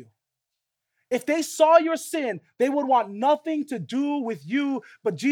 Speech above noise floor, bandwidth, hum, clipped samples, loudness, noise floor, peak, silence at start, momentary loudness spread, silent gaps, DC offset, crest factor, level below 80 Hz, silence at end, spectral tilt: 60 dB; 18 kHz; none; under 0.1%; -24 LUFS; -83 dBFS; -4 dBFS; 0 s; 11 LU; none; under 0.1%; 20 dB; -84 dBFS; 0 s; -4.5 dB/octave